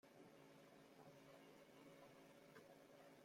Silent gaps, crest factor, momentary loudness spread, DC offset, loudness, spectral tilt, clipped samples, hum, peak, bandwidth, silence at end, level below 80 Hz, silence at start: none; 16 dB; 2 LU; under 0.1%; -66 LUFS; -4.5 dB/octave; under 0.1%; none; -50 dBFS; 16 kHz; 0 s; under -90 dBFS; 0.05 s